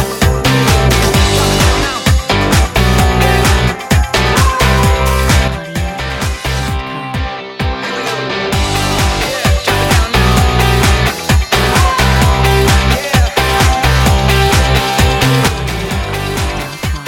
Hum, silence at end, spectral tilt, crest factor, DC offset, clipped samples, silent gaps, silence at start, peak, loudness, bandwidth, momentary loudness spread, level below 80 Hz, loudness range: none; 0 s; -4.5 dB/octave; 12 dB; under 0.1%; under 0.1%; none; 0 s; 0 dBFS; -12 LUFS; 17 kHz; 8 LU; -18 dBFS; 5 LU